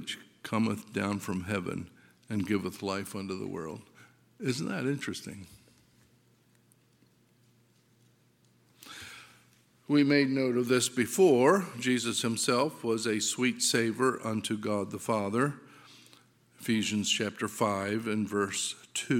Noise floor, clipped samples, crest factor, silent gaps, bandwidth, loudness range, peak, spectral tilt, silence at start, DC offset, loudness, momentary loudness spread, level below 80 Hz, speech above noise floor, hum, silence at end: -66 dBFS; under 0.1%; 22 dB; none; 17 kHz; 11 LU; -10 dBFS; -4 dB/octave; 0 s; under 0.1%; -30 LUFS; 16 LU; -72 dBFS; 37 dB; none; 0 s